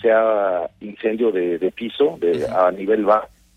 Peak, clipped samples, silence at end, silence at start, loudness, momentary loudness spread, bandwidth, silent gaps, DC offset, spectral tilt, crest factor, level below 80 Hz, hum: -4 dBFS; under 0.1%; 0.3 s; 0 s; -20 LUFS; 8 LU; 9.6 kHz; none; under 0.1%; -6.5 dB/octave; 16 dB; -58 dBFS; none